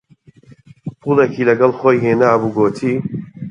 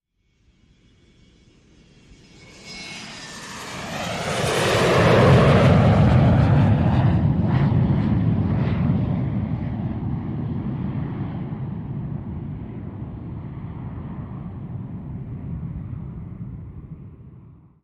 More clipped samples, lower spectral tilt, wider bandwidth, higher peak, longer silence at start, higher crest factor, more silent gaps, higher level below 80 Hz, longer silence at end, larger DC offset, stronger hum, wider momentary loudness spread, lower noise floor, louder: neither; about the same, -8 dB/octave vs -7 dB/octave; second, 9.8 kHz vs 13 kHz; first, 0 dBFS vs -4 dBFS; second, 0.85 s vs 2.4 s; about the same, 16 dB vs 18 dB; neither; second, -56 dBFS vs -36 dBFS; second, 0 s vs 0.4 s; neither; neither; second, 14 LU vs 19 LU; second, -46 dBFS vs -63 dBFS; first, -15 LUFS vs -20 LUFS